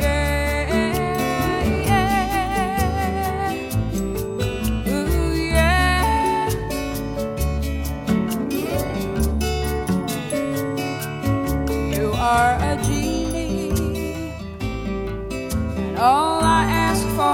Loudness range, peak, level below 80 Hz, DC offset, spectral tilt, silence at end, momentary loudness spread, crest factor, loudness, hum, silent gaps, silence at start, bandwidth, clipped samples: 3 LU; -4 dBFS; -28 dBFS; under 0.1%; -5.5 dB/octave; 0 s; 9 LU; 18 dB; -21 LUFS; none; none; 0 s; 18 kHz; under 0.1%